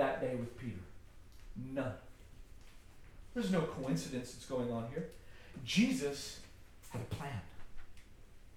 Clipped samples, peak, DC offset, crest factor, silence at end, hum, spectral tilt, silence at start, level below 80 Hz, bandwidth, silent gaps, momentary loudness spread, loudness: under 0.1%; -20 dBFS; under 0.1%; 20 dB; 0 s; none; -5.5 dB/octave; 0 s; -58 dBFS; 17 kHz; none; 25 LU; -39 LUFS